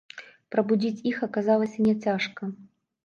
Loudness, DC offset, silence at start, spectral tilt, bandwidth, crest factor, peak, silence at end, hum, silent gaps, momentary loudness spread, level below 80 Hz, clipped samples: -26 LUFS; under 0.1%; 0.15 s; -7 dB/octave; 7 kHz; 16 dB; -10 dBFS; 0.4 s; none; none; 17 LU; -68 dBFS; under 0.1%